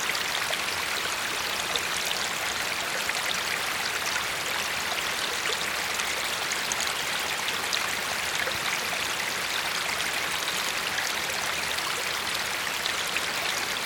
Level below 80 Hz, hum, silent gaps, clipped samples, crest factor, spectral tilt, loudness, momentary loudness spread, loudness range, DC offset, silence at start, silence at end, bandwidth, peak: -58 dBFS; none; none; under 0.1%; 22 dB; 0 dB/octave; -27 LUFS; 1 LU; 0 LU; under 0.1%; 0 s; 0 s; 19 kHz; -8 dBFS